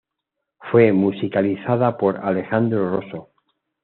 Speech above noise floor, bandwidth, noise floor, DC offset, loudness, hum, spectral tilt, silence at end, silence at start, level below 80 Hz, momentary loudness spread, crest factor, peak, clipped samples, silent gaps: 62 dB; 4.3 kHz; -80 dBFS; under 0.1%; -19 LUFS; none; -7 dB/octave; 0.6 s; 0.6 s; -64 dBFS; 13 LU; 18 dB; -2 dBFS; under 0.1%; none